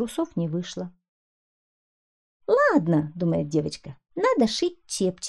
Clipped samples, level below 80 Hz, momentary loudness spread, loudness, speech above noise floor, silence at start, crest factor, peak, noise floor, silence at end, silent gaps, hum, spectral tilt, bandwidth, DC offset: under 0.1%; -60 dBFS; 17 LU; -24 LUFS; over 66 dB; 0 s; 18 dB; -8 dBFS; under -90 dBFS; 0 s; 1.08-2.40 s; none; -5.5 dB/octave; 13 kHz; 0.1%